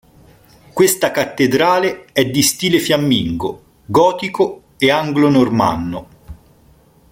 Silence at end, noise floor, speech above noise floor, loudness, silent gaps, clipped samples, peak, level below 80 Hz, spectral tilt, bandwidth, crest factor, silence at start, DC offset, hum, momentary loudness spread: 0.75 s; -50 dBFS; 35 dB; -15 LUFS; none; under 0.1%; -2 dBFS; -46 dBFS; -4 dB/octave; 17 kHz; 16 dB; 0.75 s; under 0.1%; none; 10 LU